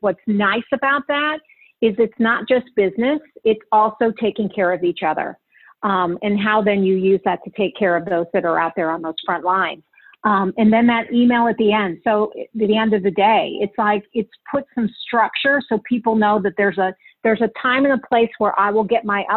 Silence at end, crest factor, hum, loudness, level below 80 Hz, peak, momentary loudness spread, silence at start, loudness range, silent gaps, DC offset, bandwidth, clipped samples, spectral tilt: 0 s; 14 dB; none; -18 LUFS; -60 dBFS; -4 dBFS; 7 LU; 0.05 s; 2 LU; none; under 0.1%; 4.3 kHz; under 0.1%; -9.5 dB/octave